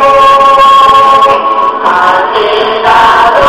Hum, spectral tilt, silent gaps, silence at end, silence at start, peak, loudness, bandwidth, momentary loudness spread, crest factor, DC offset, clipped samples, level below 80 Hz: none; -3 dB/octave; none; 0 s; 0 s; 0 dBFS; -5 LUFS; 14.5 kHz; 6 LU; 4 dB; 0.5%; 7%; -34 dBFS